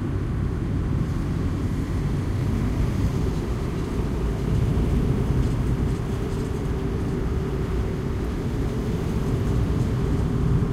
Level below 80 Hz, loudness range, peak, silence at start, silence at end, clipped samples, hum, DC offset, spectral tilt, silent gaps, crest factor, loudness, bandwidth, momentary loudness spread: -28 dBFS; 2 LU; -10 dBFS; 0 s; 0 s; under 0.1%; none; under 0.1%; -8 dB/octave; none; 14 dB; -25 LUFS; 14 kHz; 4 LU